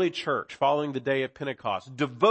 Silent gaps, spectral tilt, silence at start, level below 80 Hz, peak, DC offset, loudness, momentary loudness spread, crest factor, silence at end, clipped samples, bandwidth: none; -6 dB/octave; 0 s; -70 dBFS; -6 dBFS; under 0.1%; -28 LUFS; 7 LU; 20 dB; 0 s; under 0.1%; 8.6 kHz